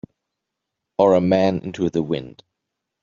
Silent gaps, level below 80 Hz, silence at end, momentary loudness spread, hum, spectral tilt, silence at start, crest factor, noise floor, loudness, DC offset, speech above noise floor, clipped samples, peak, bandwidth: none; -58 dBFS; 0.75 s; 11 LU; none; -6.5 dB/octave; 1 s; 20 dB; -81 dBFS; -20 LUFS; under 0.1%; 62 dB; under 0.1%; -2 dBFS; 7.4 kHz